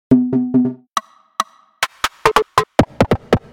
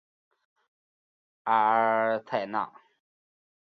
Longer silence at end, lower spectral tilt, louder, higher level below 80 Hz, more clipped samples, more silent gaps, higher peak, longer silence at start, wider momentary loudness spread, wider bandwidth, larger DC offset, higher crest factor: second, 0.15 s vs 1.1 s; second, -5.5 dB/octave vs -7 dB/octave; first, -18 LUFS vs -26 LUFS; first, -40 dBFS vs -82 dBFS; neither; first, 0.88-0.92 s vs none; first, 0 dBFS vs -10 dBFS; second, 0.1 s vs 1.45 s; about the same, 10 LU vs 12 LU; first, 17.5 kHz vs 6.2 kHz; neither; about the same, 18 dB vs 20 dB